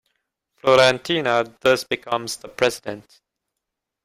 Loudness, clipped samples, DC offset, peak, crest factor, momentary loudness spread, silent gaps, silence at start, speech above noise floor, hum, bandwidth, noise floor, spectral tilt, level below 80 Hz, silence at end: -20 LUFS; under 0.1%; under 0.1%; -2 dBFS; 20 dB; 16 LU; none; 0.65 s; 62 dB; none; 16 kHz; -82 dBFS; -3.5 dB/octave; -60 dBFS; 1.05 s